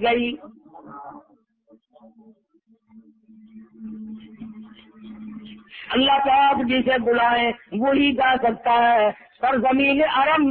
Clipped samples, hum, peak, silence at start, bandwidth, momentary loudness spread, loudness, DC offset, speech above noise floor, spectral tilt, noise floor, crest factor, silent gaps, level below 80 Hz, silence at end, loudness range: under 0.1%; none; -8 dBFS; 0 s; 4.5 kHz; 23 LU; -19 LUFS; under 0.1%; 42 dB; -8.5 dB/octave; -61 dBFS; 14 dB; none; -56 dBFS; 0 s; 23 LU